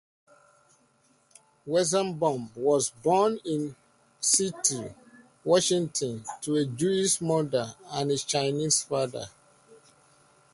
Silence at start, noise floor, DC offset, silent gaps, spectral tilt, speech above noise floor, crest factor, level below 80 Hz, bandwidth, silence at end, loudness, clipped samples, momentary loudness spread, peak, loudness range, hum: 1.65 s; -65 dBFS; under 0.1%; none; -3.5 dB/octave; 39 dB; 20 dB; -68 dBFS; 12 kHz; 0.8 s; -27 LUFS; under 0.1%; 12 LU; -8 dBFS; 2 LU; none